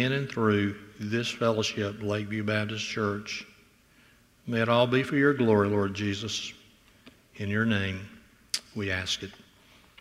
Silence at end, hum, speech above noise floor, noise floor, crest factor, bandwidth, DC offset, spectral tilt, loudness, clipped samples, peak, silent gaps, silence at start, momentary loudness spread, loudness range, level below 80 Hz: 0.65 s; none; 32 dB; -60 dBFS; 20 dB; 15.5 kHz; under 0.1%; -5 dB/octave; -28 LUFS; under 0.1%; -8 dBFS; none; 0 s; 13 LU; 5 LU; -64 dBFS